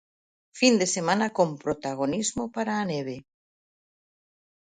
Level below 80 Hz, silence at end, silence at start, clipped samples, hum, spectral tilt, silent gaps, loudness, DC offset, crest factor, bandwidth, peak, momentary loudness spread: -64 dBFS; 1.45 s; 0.55 s; under 0.1%; none; -4 dB/octave; none; -26 LUFS; under 0.1%; 22 dB; 9.6 kHz; -6 dBFS; 10 LU